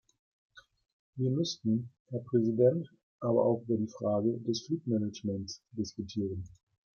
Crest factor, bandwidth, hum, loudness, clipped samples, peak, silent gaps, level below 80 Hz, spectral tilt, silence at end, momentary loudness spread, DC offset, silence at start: 18 dB; 7 kHz; none; -32 LUFS; under 0.1%; -14 dBFS; 0.93-1.13 s, 2.00-2.06 s, 3.03-3.19 s; -70 dBFS; -7 dB/octave; 0.5 s; 13 LU; under 0.1%; 0.55 s